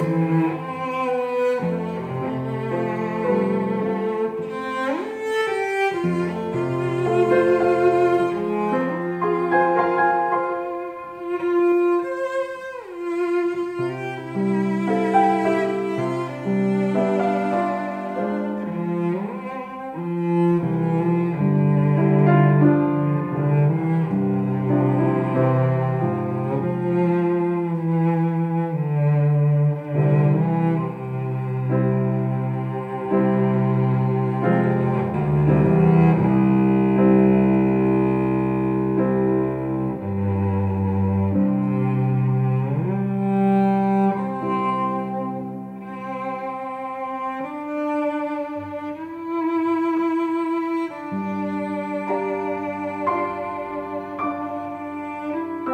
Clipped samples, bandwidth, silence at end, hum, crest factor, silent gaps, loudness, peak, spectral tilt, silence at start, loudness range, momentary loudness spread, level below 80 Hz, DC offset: under 0.1%; 9 kHz; 0 s; none; 16 dB; none; -21 LUFS; -4 dBFS; -9.5 dB/octave; 0 s; 7 LU; 11 LU; -52 dBFS; under 0.1%